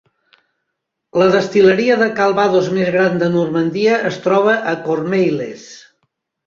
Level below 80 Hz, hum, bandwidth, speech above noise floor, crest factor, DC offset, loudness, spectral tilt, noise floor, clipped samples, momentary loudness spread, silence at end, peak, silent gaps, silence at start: -58 dBFS; none; 7.4 kHz; 61 dB; 14 dB; under 0.1%; -15 LUFS; -6 dB/octave; -76 dBFS; under 0.1%; 7 LU; 0.7 s; -2 dBFS; none; 1.15 s